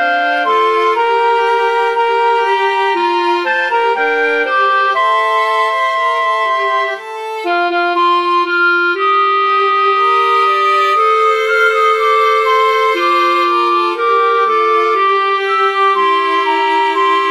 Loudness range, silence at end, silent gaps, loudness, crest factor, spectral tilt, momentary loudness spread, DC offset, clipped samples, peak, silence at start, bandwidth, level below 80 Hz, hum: 3 LU; 0 s; none; -12 LUFS; 12 dB; -1 dB/octave; 3 LU; 0.1%; under 0.1%; 0 dBFS; 0 s; 14 kHz; -70 dBFS; none